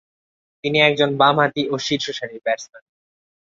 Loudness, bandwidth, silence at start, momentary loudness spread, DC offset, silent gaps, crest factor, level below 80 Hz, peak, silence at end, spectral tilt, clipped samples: -19 LUFS; 7.8 kHz; 0.65 s; 11 LU; under 0.1%; none; 20 dB; -62 dBFS; -2 dBFS; 0.75 s; -4.5 dB/octave; under 0.1%